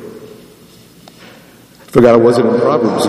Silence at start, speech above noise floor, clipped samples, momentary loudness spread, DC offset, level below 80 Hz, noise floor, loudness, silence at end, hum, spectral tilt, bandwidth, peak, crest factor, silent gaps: 0 s; 32 dB; 0.3%; 7 LU; under 0.1%; -48 dBFS; -41 dBFS; -10 LUFS; 0 s; none; -6.5 dB/octave; 15 kHz; 0 dBFS; 14 dB; none